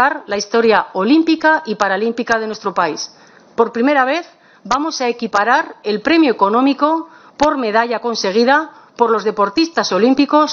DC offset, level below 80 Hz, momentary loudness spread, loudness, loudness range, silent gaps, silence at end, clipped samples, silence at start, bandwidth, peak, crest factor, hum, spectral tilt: under 0.1%; -56 dBFS; 7 LU; -15 LUFS; 3 LU; none; 0 s; under 0.1%; 0 s; 7.2 kHz; 0 dBFS; 16 dB; none; -4 dB/octave